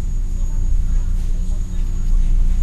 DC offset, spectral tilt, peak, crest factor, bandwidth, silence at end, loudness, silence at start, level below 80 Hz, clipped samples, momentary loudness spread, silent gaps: under 0.1%; -6.5 dB/octave; -6 dBFS; 8 dB; 7.2 kHz; 0 s; -24 LUFS; 0 s; -16 dBFS; under 0.1%; 4 LU; none